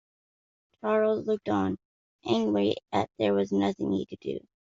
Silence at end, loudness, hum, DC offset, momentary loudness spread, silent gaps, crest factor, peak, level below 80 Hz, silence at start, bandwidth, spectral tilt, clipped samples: 0.25 s; -28 LUFS; none; under 0.1%; 11 LU; 1.85-2.19 s; 16 dB; -12 dBFS; -68 dBFS; 0.85 s; 7.6 kHz; -5 dB/octave; under 0.1%